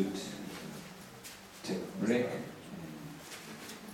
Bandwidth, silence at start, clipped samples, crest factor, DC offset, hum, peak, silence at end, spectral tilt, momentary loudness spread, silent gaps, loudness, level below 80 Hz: 17 kHz; 0 s; under 0.1%; 22 dB; under 0.1%; none; -18 dBFS; 0 s; -5 dB/octave; 15 LU; none; -40 LUFS; -70 dBFS